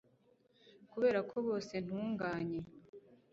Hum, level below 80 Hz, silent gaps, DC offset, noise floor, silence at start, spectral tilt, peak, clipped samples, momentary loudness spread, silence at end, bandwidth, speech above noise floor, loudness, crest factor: none; -72 dBFS; 2.89-2.93 s; under 0.1%; -71 dBFS; 0.65 s; -5.5 dB/octave; -22 dBFS; under 0.1%; 16 LU; 0.2 s; 7.6 kHz; 34 dB; -38 LUFS; 18 dB